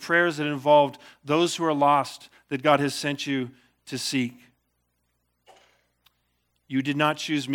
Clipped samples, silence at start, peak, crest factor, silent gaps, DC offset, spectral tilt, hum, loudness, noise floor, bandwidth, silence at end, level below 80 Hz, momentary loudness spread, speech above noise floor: under 0.1%; 0 s; -4 dBFS; 22 dB; none; under 0.1%; -4.5 dB/octave; 60 Hz at -60 dBFS; -24 LUFS; -74 dBFS; 18 kHz; 0 s; -76 dBFS; 14 LU; 50 dB